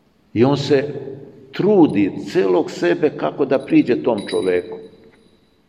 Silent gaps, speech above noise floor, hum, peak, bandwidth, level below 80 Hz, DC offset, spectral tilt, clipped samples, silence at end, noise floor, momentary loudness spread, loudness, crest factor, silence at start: none; 38 dB; none; -2 dBFS; 11.5 kHz; -62 dBFS; under 0.1%; -7 dB/octave; under 0.1%; 0.8 s; -55 dBFS; 18 LU; -18 LUFS; 16 dB; 0.35 s